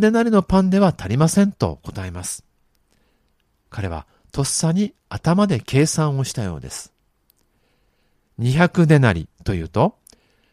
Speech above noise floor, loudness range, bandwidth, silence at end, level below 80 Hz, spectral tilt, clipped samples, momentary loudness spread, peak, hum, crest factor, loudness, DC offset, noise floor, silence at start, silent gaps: 47 dB; 5 LU; 14.5 kHz; 0.6 s; -42 dBFS; -6 dB/octave; under 0.1%; 16 LU; 0 dBFS; none; 20 dB; -19 LUFS; under 0.1%; -65 dBFS; 0 s; none